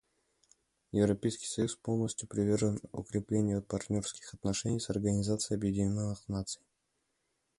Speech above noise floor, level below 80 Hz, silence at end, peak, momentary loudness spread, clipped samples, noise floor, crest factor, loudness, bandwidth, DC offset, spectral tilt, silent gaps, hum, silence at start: 48 dB; -56 dBFS; 1.05 s; -16 dBFS; 8 LU; under 0.1%; -80 dBFS; 18 dB; -34 LUFS; 11.5 kHz; under 0.1%; -6 dB/octave; none; none; 0.95 s